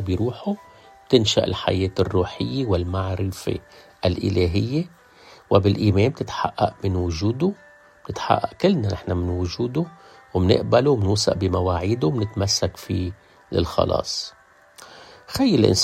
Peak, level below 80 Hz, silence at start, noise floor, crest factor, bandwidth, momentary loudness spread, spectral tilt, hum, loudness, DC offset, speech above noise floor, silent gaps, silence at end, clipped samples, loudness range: -2 dBFS; -48 dBFS; 0 s; -49 dBFS; 20 dB; 14.5 kHz; 11 LU; -5.5 dB/octave; none; -22 LUFS; under 0.1%; 28 dB; none; 0 s; under 0.1%; 3 LU